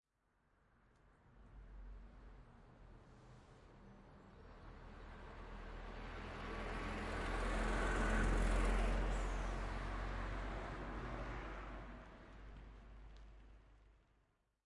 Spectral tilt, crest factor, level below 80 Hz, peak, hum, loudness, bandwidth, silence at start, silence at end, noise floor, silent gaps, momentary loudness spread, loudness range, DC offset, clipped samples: -5.5 dB/octave; 18 dB; -46 dBFS; -26 dBFS; none; -44 LUFS; 11.5 kHz; 1.3 s; 0.75 s; -80 dBFS; none; 24 LU; 21 LU; under 0.1%; under 0.1%